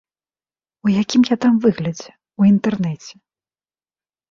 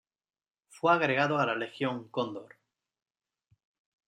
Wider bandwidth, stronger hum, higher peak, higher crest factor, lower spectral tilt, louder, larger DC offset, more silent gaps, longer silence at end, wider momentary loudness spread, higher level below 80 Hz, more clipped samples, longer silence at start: second, 7.4 kHz vs 11 kHz; neither; first, -4 dBFS vs -12 dBFS; about the same, 16 dB vs 20 dB; about the same, -6.5 dB/octave vs -6 dB/octave; first, -17 LUFS vs -29 LUFS; neither; neither; second, 1.2 s vs 1.6 s; first, 15 LU vs 10 LU; first, -58 dBFS vs -80 dBFS; neither; about the same, 0.85 s vs 0.75 s